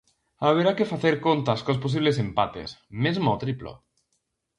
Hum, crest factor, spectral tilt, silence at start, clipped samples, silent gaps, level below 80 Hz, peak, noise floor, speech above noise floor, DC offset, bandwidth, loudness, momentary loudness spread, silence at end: none; 18 dB; -7 dB/octave; 0.4 s; under 0.1%; none; -56 dBFS; -8 dBFS; -76 dBFS; 52 dB; under 0.1%; 10.5 kHz; -24 LUFS; 12 LU; 0.85 s